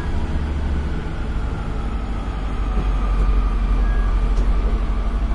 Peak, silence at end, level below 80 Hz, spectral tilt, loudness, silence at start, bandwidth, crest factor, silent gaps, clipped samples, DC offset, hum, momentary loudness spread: -8 dBFS; 0 s; -20 dBFS; -7.5 dB/octave; -24 LUFS; 0 s; 6 kHz; 12 dB; none; under 0.1%; under 0.1%; none; 5 LU